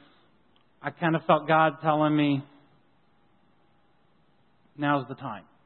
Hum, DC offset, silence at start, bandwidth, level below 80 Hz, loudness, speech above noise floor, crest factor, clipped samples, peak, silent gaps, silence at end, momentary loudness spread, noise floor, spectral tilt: none; under 0.1%; 0.85 s; 4.3 kHz; -74 dBFS; -26 LUFS; 41 dB; 22 dB; under 0.1%; -6 dBFS; none; 0.25 s; 16 LU; -66 dBFS; -10.5 dB/octave